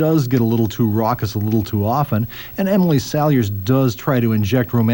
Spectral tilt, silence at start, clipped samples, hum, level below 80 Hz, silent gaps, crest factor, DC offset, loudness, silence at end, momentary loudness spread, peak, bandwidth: -7.5 dB/octave; 0 s; under 0.1%; none; -46 dBFS; none; 12 dB; 0.2%; -18 LUFS; 0 s; 4 LU; -4 dBFS; 17 kHz